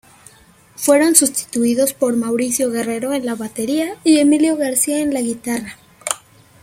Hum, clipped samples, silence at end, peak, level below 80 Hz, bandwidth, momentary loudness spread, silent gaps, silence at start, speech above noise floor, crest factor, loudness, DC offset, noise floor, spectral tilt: none; under 0.1%; 0.45 s; 0 dBFS; -58 dBFS; 16.5 kHz; 12 LU; none; 0.8 s; 32 dB; 18 dB; -17 LUFS; under 0.1%; -48 dBFS; -2.5 dB/octave